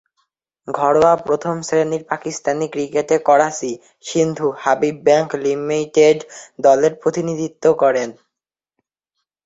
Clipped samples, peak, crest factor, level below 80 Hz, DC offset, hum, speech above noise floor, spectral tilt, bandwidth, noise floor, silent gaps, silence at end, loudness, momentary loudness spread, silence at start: under 0.1%; 0 dBFS; 18 dB; -58 dBFS; under 0.1%; none; 68 dB; -5 dB/octave; 8 kHz; -85 dBFS; none; 1.35 s; -17 LUFS; 10 LU; 0.65 s